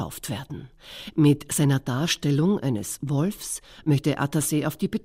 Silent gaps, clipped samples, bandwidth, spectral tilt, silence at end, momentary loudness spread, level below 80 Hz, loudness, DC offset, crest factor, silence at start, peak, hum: none; under 0.1%; 16 kHz; -5.5 dB/octave; 0.05 s; 12 LU; -54 dBFS; -25 LUFS; under 0.1%; 16 dB; 0 s; -8 dBFS; none